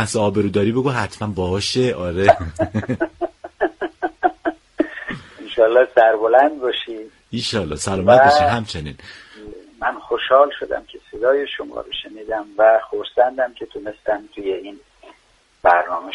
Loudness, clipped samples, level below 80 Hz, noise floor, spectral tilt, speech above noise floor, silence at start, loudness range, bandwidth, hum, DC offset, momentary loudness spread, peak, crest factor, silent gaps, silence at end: -18 LUFS; under 0.1%; -46 dBFS; -56 dBFS; -5 dB/octave; 39 dB; 0 s; 5 LU; 11.5 kHz; none; under 0.1%; 16 LU; 0 dBFS; 18 dB; none; 0 s